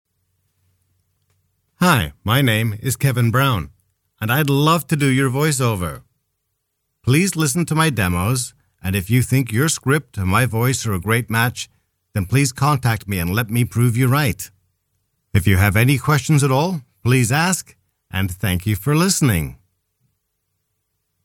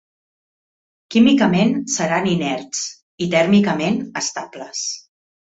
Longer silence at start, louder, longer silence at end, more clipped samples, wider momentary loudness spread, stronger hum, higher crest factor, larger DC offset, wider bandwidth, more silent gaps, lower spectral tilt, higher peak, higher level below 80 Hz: first, 1.8 s vs 1.1 s; about the same, -18 LUFS vs -18 LUFS; first, 1.7 s vs 0.5 s; neither; second, 9 LU vs 12 LU; neither; about the same, 18 dB vs 16 dB; neither; first, 18 kHz vs 8 kHz; second, none vs 3.03-3.18 s; about the same, -5 dB/octave vs -4.5 dB/octave; about the same, 0 dBFS vs -2 dBFS; first, -44 dBFS vs -58 dBFS